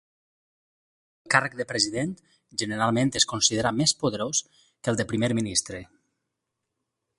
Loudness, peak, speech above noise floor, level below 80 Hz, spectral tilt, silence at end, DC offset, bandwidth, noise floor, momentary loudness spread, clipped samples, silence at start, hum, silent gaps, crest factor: -25 LUFS; -2 dBFS; 57 dB; -58 dBFS; -3 dB/octave; 1.35 s; under 0.1%; 11.5 kHz; -83 dBFS; 11 LU; under 0.1%; 1.25 s; none; none; 26 dB